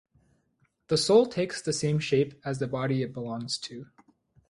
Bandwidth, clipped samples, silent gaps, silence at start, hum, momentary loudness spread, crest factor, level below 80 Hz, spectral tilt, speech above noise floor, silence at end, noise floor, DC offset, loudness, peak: 11.5 kHz; under 0.1%; none; 0.9 s; none; 12 LU; 20 dB; -64 dBFS; -5 dB/octave; 44 dB; 0.65 s; -71 dBFS; under 0.1%; -27 LUFS; -8 dBFS